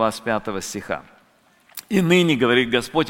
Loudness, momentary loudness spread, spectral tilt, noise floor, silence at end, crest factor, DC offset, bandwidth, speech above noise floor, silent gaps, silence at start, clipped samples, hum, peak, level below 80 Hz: -20 LUFS; 14 LU; -5 dB/octave; -58 dBFS; 0 s; 18 dB; under 0.1%; 17 kHz; 38 dB; none; 0 s; under 0.1%; none; -2 dBFS; -52 dBFS